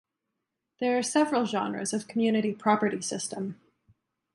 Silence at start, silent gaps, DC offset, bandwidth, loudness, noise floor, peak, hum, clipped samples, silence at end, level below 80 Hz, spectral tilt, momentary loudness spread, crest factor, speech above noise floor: 0.8 s; none; under 0.1%; 11.5 kHz; -28 LUFS; -84 dBFS; -8 dBFS; none; under 0.1%; 0.8 s; -74 dBFS; -4 dB/octave; 8 LU; 20 dB; 56 dB